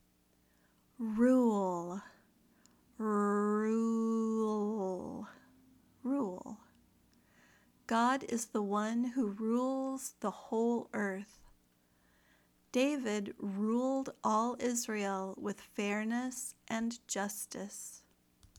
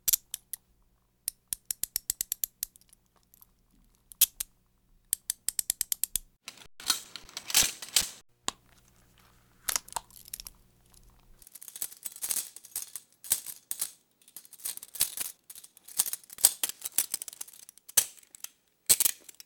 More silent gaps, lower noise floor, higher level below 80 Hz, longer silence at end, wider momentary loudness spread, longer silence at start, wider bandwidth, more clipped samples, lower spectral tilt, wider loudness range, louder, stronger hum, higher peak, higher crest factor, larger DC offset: neither; about the same, -71 dBFS vs -69 dBFS; second, -74 dBFS vs -62 dBFS; first, 0.6 s vs 0.3 s; second, 13 LU vs 20 LU; first, 1 s vs 0.05 s; about the same, 18.5 kHz vs over 20 kHz; neither; first, -5 dB/octave vs 2 dB/octave; second, 5 LU vs 9 LU; second, -35 LUFS vs -30 LUFS; neither; second, -18 dBFS vs -4 dBFS; second, 18 dB vs 32 dB; neither